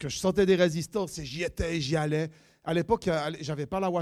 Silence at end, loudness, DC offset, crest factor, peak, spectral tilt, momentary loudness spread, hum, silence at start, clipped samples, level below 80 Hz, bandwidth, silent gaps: 0 s; -28 LUFS; under 0.1%; 18 dB; -10 dBFS; -5.5 dB/octave; 10 LU; none; 0 s; under 0.1%; -48 dBFS; 14.5 kHz; none